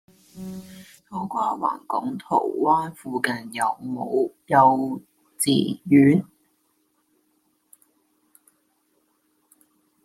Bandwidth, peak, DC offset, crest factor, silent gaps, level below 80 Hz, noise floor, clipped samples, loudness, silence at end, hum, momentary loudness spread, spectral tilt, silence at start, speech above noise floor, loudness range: 15 kHz; -4 dBFS; under 0.1%; 20 dB; none; -68 dBFS; -68 dBFS; under 0.1%; -22 LUFS; 3.8 s; none; 20 LU; -5.5 dB/octave; 0.35 s; 47 dB; 5 LU